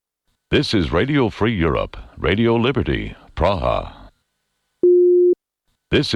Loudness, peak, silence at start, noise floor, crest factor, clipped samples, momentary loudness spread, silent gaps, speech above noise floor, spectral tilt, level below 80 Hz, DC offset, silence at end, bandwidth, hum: -18 LUFS; -4 dBFS; 0.5 s; -72 dBFS; 16 dB; under 0.1%; 11 LU; none; 54 dB; -7 dB/octave; -34 dBFS; under 0.1%; 0 s; 10 kHz; none